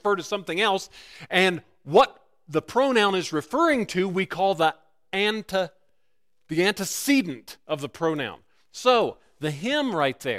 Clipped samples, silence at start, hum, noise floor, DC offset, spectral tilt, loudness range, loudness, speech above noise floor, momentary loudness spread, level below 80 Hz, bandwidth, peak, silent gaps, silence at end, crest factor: under 0.1%; 0.05 s; none; -78 dBFS; under 0.1%; -4 dB/octave; 4 LU; -24 LUFS; 54 dB; 12 LU; -62 dBFS; 16 kHz; -6 dBFS; none; 0 s; 18 dB